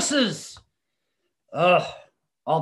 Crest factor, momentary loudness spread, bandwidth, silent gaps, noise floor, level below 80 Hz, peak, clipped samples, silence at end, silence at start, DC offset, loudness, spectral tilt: 18 dB; 18 LU; 12.5 kHz; none; -80 dBFS; -66 dBFS; -8 dBFS; under 0.1%; 0 s; 0 s; under 0.1%; -22 LUFS; -3.5 dB/octave